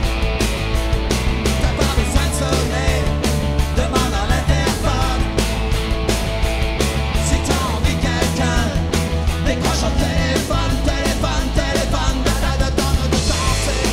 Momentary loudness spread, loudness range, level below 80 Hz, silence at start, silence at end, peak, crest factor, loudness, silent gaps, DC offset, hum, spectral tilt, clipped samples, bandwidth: 2 LU; 1 LU; -20 dBFS; 0 s; 0 s; -2 dBFS; 16 dB; -19 LUFS; none; under 0.1%; none; -4.5 dB/octave; under 0.1%; 16 kHz